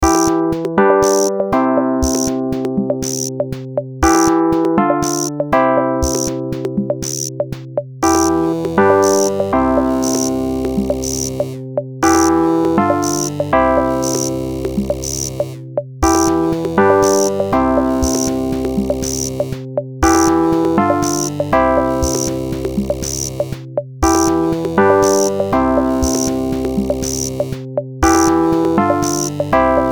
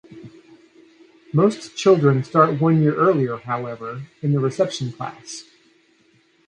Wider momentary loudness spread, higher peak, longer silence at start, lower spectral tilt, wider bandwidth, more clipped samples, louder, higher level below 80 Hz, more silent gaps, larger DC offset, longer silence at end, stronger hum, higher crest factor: second, 9 LU vs 16 LU; about the same, 0 dBFS vs -2 dBFS; about the same, 0 s vs 0.1 s; second, -4.5 dB/octave vs -7 dB/octave; first, over 20 kHz vs 10 kHz; neither; first, -16 LUFS vs -20 LUFS; first, -32 dBFS vs -64 dBFS; neither; first, 0.2% vs under 0.1%; second, 0 s vs 1.05 s; neither; about the same, 16 dB vs 18 dB